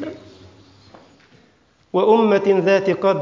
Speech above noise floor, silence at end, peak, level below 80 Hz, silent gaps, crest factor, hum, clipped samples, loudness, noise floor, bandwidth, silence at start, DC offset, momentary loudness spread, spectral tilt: 41 dB; 0 s; -2 dBFS; -62 dBFS; none; 18 dB; none; under 0.1%; -17 LUFS; -57 dBFS; 7.4 kHz; 0 s; under 0.1%; 8 LU; -7 dB/octave